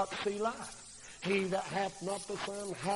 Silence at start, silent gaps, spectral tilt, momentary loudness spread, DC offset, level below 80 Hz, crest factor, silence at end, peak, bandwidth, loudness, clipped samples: 0 s; none; -4 dB/octave; 12 LU; under 0.1%; -66 dBFS; 18 dB; 0 s; -18 dBFS; 11.5 kHz; -36 LUFS; under 0.1%